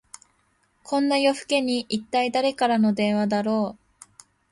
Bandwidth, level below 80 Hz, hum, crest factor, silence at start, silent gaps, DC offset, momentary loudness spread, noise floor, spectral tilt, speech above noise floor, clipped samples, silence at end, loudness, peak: 11.5 kHz; -66 dBFS; none; 16 dB; 0.85 s; none; under 0.1%; 6 LU; -67 dBFS; -5 dB/octave; 44 dB; under 0.1%; 0.8 s; -23 LUFS; -8 dBFS